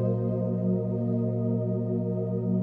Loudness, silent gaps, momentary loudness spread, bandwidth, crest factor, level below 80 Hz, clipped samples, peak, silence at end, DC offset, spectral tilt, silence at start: -28 LUFS; none; 2 LU; 2 kHz; 12 dB; -60 dBFS; under 0.1%; -16 dBFS; 0 s; 0.1%; -13.5 dB/octave; 0 s